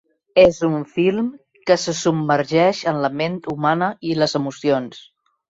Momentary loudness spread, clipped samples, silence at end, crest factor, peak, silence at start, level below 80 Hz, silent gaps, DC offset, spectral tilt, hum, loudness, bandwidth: 9 LU; under 0.1%; 0.5 s; 18 dB; -2 dBFS; 0.35 s; -54 dBFS; none; under 0.1%; -5.5 dB/octave; none; -19 LUFS; 8 kHz